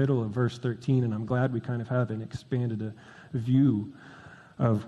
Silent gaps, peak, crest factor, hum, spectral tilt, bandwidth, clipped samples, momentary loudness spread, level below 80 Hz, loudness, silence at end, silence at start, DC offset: none; -10 dBFS; 18 dB; none; -9 dB/octave; 8 kHz; under 0.1%; 21 LU; -62 dBFS; -29 LUFS; 0 s; 0 s; under 0.1%